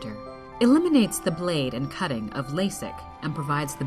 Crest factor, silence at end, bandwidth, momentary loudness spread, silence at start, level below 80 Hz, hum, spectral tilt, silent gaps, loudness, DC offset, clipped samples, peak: 16 dB; 0 s; 14 kHz; 16 LU; 0 s; -52 dBFS; none; -5.5 dB/octave; none; -25 LUFS; under 0.1%; under 0.1%; -8 dBFS